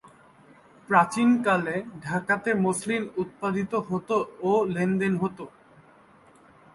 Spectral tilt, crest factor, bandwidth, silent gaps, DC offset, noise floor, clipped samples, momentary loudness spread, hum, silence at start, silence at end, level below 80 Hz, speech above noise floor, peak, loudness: -6 dB/octave; 22 dB; 11.5 kHz; none; under 0.1%; -55 dBFS; under 0.1%; 9 LU; none; 0.9 s; 1.25 s; -64 dBFS; 30 dB; -4 dBFS; -25 LUFS